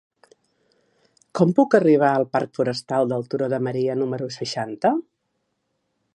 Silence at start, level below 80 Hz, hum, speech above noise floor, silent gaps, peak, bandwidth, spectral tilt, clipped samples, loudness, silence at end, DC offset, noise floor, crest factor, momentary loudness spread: 1.35 s; -72 dBFS; none; 54 dB; none; -2 dBFS; 11.5 kHz; -6.5 dB/octave; under 0.1%; -21 LUFS; 1.15 s; under 0.1%; -74 dBFS; 20 dB; 11 LU